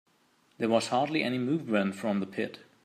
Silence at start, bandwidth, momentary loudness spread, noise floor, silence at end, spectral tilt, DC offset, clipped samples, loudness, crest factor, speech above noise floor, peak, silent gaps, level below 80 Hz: 0.6 s; 14 kHz; 8 LU; -67 dBFS; 0.25 s; -5.5 dB/octave; under 0.1%; under 0.1%; -30 LUFS; 20 dB; 38 dB; -12 dBFS; none; -78 dBFS